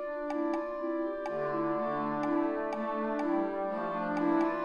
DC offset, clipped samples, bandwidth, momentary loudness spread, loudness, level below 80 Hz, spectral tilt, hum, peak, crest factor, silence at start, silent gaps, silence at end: under 0.1%; under 0.1%; 7 kHz; 5 LU; -32 LUFS; -64 dBFS; -7.5 dB/octave; none; -18 dBFS; 14 dB; 0 s; none; 0 s